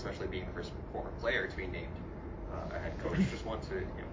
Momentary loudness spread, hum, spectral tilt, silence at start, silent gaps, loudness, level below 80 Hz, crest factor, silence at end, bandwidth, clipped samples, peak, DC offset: 10 LU; none; -6.5 dB/octave; 0 s; none; -38 LUFS; -46 dBFS; 18 dB; 0 s; 7.6 kHz; under 0.1%; -20 dBFS; under 0.1%